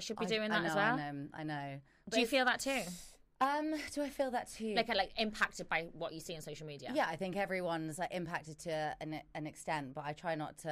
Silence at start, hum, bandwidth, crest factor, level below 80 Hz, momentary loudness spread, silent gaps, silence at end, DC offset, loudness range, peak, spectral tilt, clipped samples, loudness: 0 s; none; 15.5 kHz; 20 dB; -64 dBFS; 12 LU; none; 0 s; under 0.1%; 4 LU; -18 dBFS; -4 dB/octave; under 0.1%; -37 LUFS